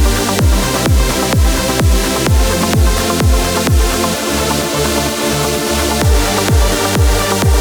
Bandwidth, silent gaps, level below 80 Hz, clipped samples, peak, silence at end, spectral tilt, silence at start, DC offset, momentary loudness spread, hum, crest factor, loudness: over 20 kHz; none; -16 dBFS; under 0.1%; -2 dBFS; 0 s; -4 dB/octave; 0 s; under 0.1%; 2 LU; none; 10 dB; -13 LUFS